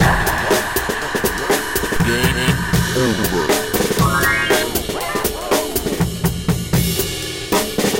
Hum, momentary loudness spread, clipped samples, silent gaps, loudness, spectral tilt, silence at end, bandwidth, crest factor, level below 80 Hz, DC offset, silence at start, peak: none; 5 LU; under 0.1%; none; -18 LUFS; -4 dB/octave; 0 s; 17 kHz; 16 dB; -30 dBFS; under 0.1%; 0 s; -2 dBFS